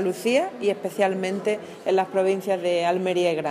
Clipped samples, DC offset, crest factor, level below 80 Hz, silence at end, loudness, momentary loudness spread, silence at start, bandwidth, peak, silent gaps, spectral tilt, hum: under 0.1%; under 0.1%; 16 dB; -78 dBFS; 0 s; -24 LUFS; 4 LU; 0 s; 15.5 kHz; -8 dBFS; none; -5 dB/octave; none